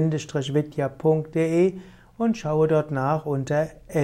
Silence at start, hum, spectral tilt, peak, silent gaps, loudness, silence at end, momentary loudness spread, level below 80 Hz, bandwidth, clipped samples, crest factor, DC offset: 0 s; none; -7.5 dB/octave; -10 dBFS; none; -24 LUFS; 0 s; 6 LU; -54 dBFS; 13 kHz; under 0.1%; 14 dB; under 0.1%